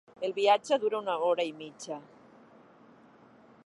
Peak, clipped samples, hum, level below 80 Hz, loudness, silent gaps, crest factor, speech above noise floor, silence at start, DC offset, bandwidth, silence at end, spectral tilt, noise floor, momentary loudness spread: -12 dBFS; under 0.1%; none; -84 dBFS; -29 LUFS; none; 20 dB; 28 dB; 0.2 s; under 0.1%; 11.5 kHz; 1.65 s; -3.5 dB/octave; -57 dBFS; 16 LU